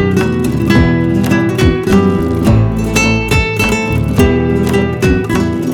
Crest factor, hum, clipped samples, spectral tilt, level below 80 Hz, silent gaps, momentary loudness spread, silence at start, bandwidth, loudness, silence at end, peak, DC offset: 12 dB; none; under 0.1%; -6.5 dB/octave; -24 dBFS; none; 3 LU; 0 s; 18.5 kHz; -12 LUFS; 0 s; 0 dBFS; under 0.1%